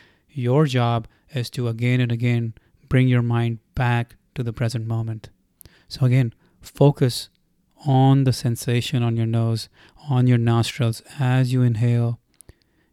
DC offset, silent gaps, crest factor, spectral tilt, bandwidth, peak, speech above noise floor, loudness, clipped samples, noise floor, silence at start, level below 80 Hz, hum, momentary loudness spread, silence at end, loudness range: under 0.1%; none; 18 dB; -7 dB/octave; 13 kHz; -4 dBFS; 34 dB; -21 LUFS; under 0.1%; -54 dBFS; 0.35 s; -50 dBFS; none; 13 LU; 0.75 s; 3 LU